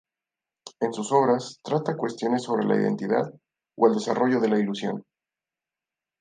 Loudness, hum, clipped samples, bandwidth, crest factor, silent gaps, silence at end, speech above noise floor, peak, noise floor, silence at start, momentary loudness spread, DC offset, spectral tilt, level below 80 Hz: -25 LUFS; none; under 0.1%; 9.6 kHz; 20 dB; none; 1.2 s; 66 dB; -6 dBFS; -90 dBFS; 0.65 s; 9 LU; under 0.1%; -6 dB/octave; -74 dBFS